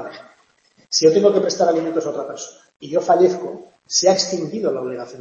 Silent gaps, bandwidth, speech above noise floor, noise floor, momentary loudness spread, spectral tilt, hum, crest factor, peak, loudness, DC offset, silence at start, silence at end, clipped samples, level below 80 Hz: 2.76-2.80 s; 8 kHz; 39 dB; -58 dBFS; 17 LU; -3.5 dB/octave; none; 18 dB; -2 dBFS; -18 LUFS; under 0.1%; 0 s; 0 s; under 0.1%; -68 dBFS